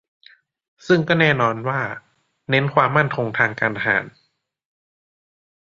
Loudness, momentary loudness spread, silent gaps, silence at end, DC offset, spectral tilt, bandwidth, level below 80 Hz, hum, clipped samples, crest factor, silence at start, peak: -19 LUFS; 9 LU; none; 1.5 s; under 0.1%; -6.5 dB/octave; 7.6 kHz; -60 dBFS; none; under 0.1%; 20 dB; 0.85 s; -2 dBFS